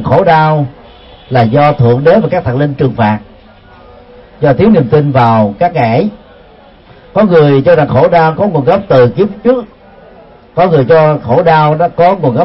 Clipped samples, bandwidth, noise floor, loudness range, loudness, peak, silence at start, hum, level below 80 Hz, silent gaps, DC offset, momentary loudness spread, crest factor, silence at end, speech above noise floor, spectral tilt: 0.2%; 5.8 kHz; -38 dBFS; 2 LU; -9 LUFS; 0 dBFS; 0 s; none; -40 dBFS; none; under 0.1%; 7 LU; 10 dB; 0 s; 30 dB; -10 dB/octave